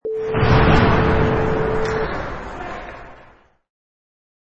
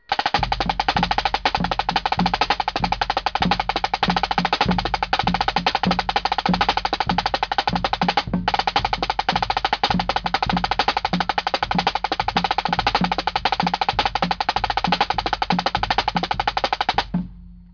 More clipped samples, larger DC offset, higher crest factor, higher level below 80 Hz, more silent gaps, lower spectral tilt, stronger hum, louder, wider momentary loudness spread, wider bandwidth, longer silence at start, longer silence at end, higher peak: neither; neither; about the same, 18 dB vs 14 dB; first, -28 dBFS vs -36 dBFS; neither; first, -7.5 dB/octave vs -4.5 dB/octave; neither; first, -18 LUFS vs -21 LUFS; first, 17 LU vs 2 LU; first, 8 kHz vs 5.4 kHz; about the same, 0.05 s vs 0.1 s; first, 1.4 s vs 0.1 s; first, -2 dBFS vs -6 dBFS